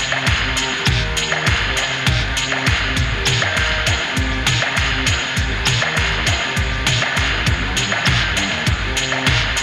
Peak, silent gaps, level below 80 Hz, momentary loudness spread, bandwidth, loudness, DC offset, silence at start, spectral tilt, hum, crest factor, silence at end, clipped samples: -2 dBFS; none; -26 dBFS; 2 LU; 15.5 kHz; -17 LUFS; under 0.1%; 0 s; -3 dB/octave; none; 16 dB; 0 s; under 0.1%